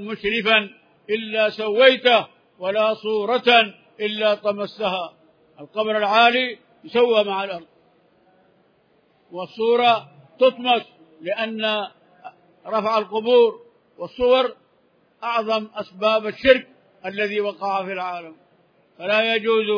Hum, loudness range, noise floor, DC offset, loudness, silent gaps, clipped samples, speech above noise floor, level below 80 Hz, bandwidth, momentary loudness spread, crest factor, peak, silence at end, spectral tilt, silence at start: none; 5 LU; -61 dBFS; under 0.1%; -20 LUFS; none; under 0.1%; 41 dB; -60 dBFS; 5.4 kHz; 18 LU; 22 dB; 0 dBFS; 0 s; -5 dB/octave; 0 s